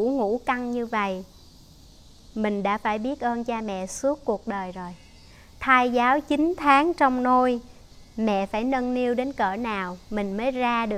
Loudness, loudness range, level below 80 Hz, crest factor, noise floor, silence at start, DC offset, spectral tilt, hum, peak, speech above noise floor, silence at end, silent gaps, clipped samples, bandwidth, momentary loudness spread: -24 LUFS; 7 LU; -50 dBFS; 20 dB; -50 dBFS; 0 s; under 0.1%; -5 dB/octave; none; -4 dBFS; 26 dB; 0 s; none; under 0.1%; 14 kHz; 12 LU